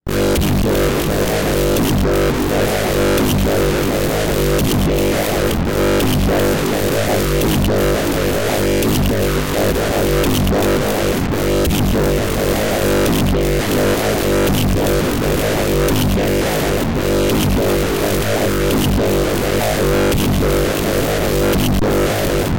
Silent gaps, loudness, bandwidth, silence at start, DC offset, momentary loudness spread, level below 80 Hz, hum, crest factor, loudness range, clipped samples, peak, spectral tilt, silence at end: none; -16 LUFS; 17.5 kHz; 0 s; 1%; 2 LU; -24 dBFS; none; 10 dB; 0 LU; under 0.1%; -6 dBFS; -5 dB/octave; 0 s